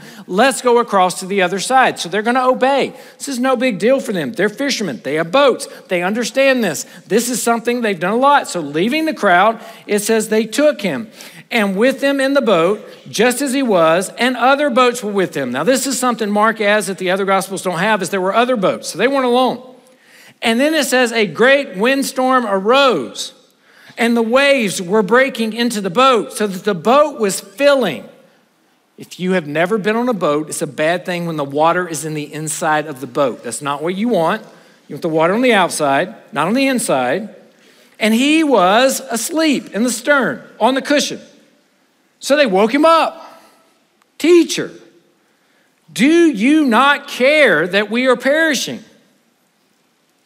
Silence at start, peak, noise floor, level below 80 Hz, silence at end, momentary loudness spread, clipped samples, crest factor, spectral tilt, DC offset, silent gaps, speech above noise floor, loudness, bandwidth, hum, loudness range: 0 s; 0 dBFS; -59 dBFS; -68 dBFS; 1.45 s; 10 LU; under 0.1%; 14 dB; -4 dB/octave; under 0.1%; none; 44 dB; -15 LUFS; 16 kHz; none; 4 LU